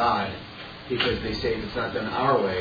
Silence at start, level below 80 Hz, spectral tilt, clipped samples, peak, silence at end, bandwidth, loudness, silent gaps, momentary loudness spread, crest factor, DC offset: 0 s; -46 dBFS; -6.5 dB/octave; under 0.1%; -8 dBFS; 0 s; 5 kHz; -26 LUFS; none; 14 LU; 18 dB; under 0.1%